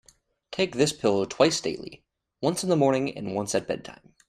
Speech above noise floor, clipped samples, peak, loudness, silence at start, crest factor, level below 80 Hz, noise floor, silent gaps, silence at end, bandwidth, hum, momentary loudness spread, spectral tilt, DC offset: 29 dB; under 0.1%; -4 dBFS; -26 LUFS; 0.5 s; 22 dB; -62 dBFS; -54 dBFS; none; 0.35 s; 14 kHz; none; 14 LU; -4.5 dB/octave; under 0.1%